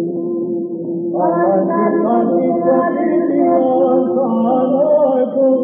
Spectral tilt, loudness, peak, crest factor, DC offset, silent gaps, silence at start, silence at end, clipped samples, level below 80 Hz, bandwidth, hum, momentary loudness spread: -8.5 dB/octave; -15 LUFS; -2 dBFS; 12 dB; under 0.1%; none; 0 s; 0 s; under 0.1%; -78 dBFS; 3.5 kHz; none; 7 LU